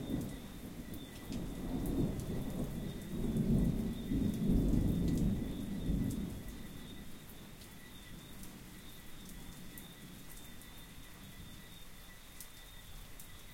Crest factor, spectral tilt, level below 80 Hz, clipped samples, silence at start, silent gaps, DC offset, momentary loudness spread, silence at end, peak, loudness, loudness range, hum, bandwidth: 20 dB; -6.5 dB/octave; -46 dBFS; under 0.1%; 0 s; none; under 0.1%; 19 LU; 0 s; -20 dBFS; -38 LUFS; 16 LU; none; 17 kHz